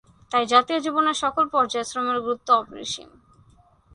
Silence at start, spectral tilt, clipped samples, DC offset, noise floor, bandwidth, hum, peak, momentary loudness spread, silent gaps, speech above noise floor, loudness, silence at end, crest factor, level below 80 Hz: 0.3 s; -2.5 dB/octave; under 0.1%; under 0.1%; -56 dBFS; 11 kHz; none; -4 dBFS; 12 LU; none; 34 dB; -22 LUFS; 0.9 s; 20 dB; -62 dBFS